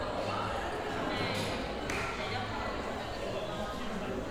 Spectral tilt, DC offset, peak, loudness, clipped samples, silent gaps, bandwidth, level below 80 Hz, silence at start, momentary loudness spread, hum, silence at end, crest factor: -4.5 dB/octave; under 0.1%; -18 dBFS; -35 LUFS; under 0.1%; none; 18 kHz; -48 dBFS; 0 s; 4 LU; none; 0 s; 16 dB